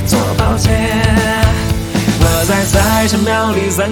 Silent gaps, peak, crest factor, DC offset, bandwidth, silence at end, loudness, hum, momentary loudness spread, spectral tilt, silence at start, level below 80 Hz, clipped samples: none; 0 dBFS; 12 dB; under 0.1%; 19.5 kHz; 0 s; -13 LUFS; none; 3 LU; -5 dB/octave; 0 s; -20 dBFS; under 0.1%